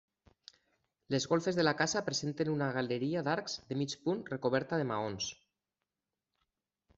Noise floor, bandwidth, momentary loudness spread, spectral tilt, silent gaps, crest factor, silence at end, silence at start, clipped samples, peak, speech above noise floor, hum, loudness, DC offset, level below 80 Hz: under -90 dBFS; 8.2 kHz; 7 LU; -4.5 dB/octave; none; 20 dB; 1.65 s; 1.1 s; under 0.1%; -16 dBFS; over 56 dB; none; -34 LUFS; under 0.1%; -72 dBFS